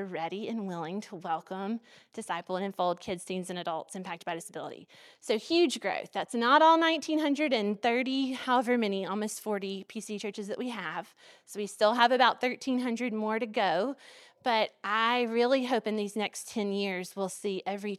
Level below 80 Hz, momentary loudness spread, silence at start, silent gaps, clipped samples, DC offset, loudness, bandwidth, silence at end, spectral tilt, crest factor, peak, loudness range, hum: -80 dBFS; 14 LU; 0 s; none; under 0.1%; under 0.1%; -30 LUFS; 14.5 kHz; 0 s; -4 dB/octave; 22 dB; -8 dBFS; 9 LU; none